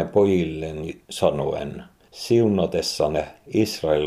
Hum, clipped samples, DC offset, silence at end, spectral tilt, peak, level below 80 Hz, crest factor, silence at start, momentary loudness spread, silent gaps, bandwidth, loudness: none; under 0.1%; under 0.1%; 0 s; -6 dB/octave; -4 dBFS; -48 dBFS; 18 dB; 0 s; 14 LU; none; 15.5 kHz; -23 LUFS